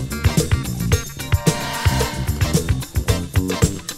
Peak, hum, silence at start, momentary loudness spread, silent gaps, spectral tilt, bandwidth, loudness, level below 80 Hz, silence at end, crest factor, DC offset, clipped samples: 0 dBFS; none; 0 s; 3 LU; none; -5 dB/octave; 16 kHz; -20 LUFS; -28 dBFS; 0 s; 20 dB; under 0.1%; under 0.1%